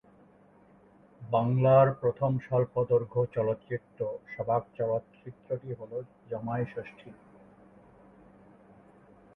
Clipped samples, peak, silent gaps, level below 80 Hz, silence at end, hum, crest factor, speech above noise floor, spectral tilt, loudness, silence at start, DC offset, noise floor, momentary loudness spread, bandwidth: under 0.1%; -10 dBFS; none; -64 dBFS; 2.25 s; none; 22 dB; 30 dB; -11 dB/octave; -29 LUFS; 1.2 s; under 0.1%; -59 dBFS; 18 LU; 3.8 kHz